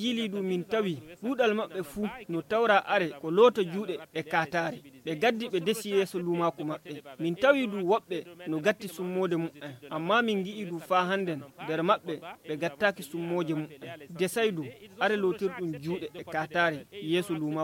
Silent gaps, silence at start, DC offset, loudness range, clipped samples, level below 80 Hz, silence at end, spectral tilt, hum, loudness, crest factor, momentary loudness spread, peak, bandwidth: none; 0 s; under 0.1%; 4 LU; under 0.1%; -70 dBFS; 0 s; -5.5 dB/octave; none; -29 LUFS; 20 dB; 13 LU; -8 dBFS; 17 kHz